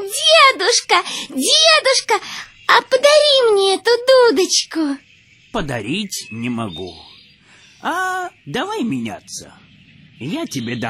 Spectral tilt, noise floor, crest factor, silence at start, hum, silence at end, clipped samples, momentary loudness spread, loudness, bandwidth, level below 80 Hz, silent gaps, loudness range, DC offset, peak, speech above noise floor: -2 dB/octave; -48 dBFS; 16 dB; 0 s; none; 0 s; under 0.1%; 17 LU; -15 LUFS; 16 kHz; -50 dBFS; none; 13 LU; under 0.1%; 0 dBFS; 31 dB